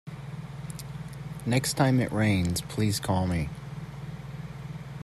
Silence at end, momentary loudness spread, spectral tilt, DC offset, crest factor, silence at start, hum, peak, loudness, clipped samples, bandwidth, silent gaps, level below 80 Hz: 0 s; 16 LU; -5.5 dB/octave; under 0.1%; 18 dB; 0.05 s; none; -10 dBFS; -29 LUFS; under 0.1%; 15.5 kHz; none; -50 dBFS